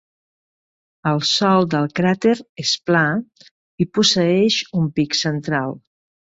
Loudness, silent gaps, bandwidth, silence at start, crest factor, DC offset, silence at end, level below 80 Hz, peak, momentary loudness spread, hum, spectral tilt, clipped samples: -18 LUFS; 2.49-2.56 s, 3.51-3.78 s; 8 kHz; 1.05 s; 16 dB; under 0.1%; 0.55 s; -58 dBFS; -4 dBFS; 8 LU; none; -4.5 dB/octave; under 0.1%